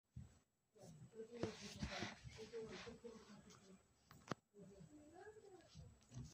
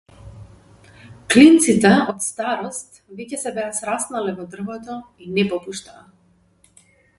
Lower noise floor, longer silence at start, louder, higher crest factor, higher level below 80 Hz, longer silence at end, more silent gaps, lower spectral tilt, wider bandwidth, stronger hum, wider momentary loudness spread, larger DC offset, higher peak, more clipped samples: first, -75 dBFS vs -58 dBFS; about the same, 0.15 s vs 0.25 s; second, -56 LUFS vs -18 LUFS; first, 28 dB vs 20 dB; second, -70 dBFS vs -54 dBFS; second, 0 s vs 1.4 s; neither; about the same, -4.5 dB/octave vs -4 dB/octave; first, 15.5 kHz vs 11.5 kHz; neither; second, 15 LU vs 22 LU; neither; second, -28 dBFS vs 0 dBFS; neither